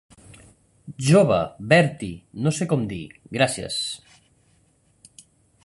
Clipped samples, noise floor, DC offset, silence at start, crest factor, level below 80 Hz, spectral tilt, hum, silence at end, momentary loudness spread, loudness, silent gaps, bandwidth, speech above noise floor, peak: under 0.1%; -62 dBFS; under 0.1%; 0.85 s; 22 dB; -54 dBFS; -5.5 dB/octave; none; 1.65 s; 17 LU; -22 LUFS; none; 11.5 kHz; 41 dB; -2 dBFS